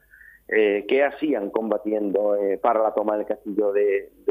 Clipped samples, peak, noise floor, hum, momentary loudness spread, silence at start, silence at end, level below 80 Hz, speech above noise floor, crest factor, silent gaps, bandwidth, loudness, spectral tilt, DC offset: under 0.1%; -6 dBFS; -48 dBFS; none; 5 LU; 0.5 s; 0 s; -64 dBFS; 25 dB; 16 dB; none; 13.5 kHz; -23 LUFS; -7.5 dB/octave; under 0.1%